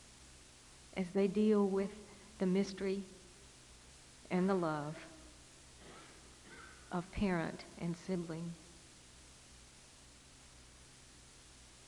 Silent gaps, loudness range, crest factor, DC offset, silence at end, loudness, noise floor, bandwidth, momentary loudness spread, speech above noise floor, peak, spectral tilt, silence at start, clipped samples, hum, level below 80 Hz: none; 11 LU; 20 dB; under 0.1%; 0 s; -37 LUFS; -60 dBFS; 12 kHz; 23 LU; 24 dB; -20 dBFS; -6.5 dB/octave; 0 s; under 0.1%; none; -62 dBFS